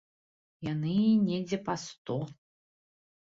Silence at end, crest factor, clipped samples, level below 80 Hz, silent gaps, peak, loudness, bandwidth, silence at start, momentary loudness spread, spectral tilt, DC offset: 0.9 s; 16 dB; under 0.1%; -68 dBFS; 1.98-2.05 s; -16 dBFS; -31 LUFS; 7.8 kHz; 0.6 s; 12 LU; -7 dB/octave; under 0.1%